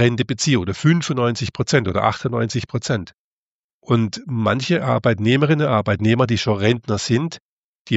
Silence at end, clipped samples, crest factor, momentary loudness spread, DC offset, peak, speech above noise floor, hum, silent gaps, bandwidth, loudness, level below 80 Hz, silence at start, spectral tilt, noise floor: 0 s; under 0.1%; 18 dB; 6 LU; under 0.1%; -2 dBFS; over 71 dB; none; 3.14-3.81 s, 7.40-7.85 s; 8.2 kHz; -19 LUFS; -50 dBFS; 0 s; -5.5 dB/octave; under -90 dBFS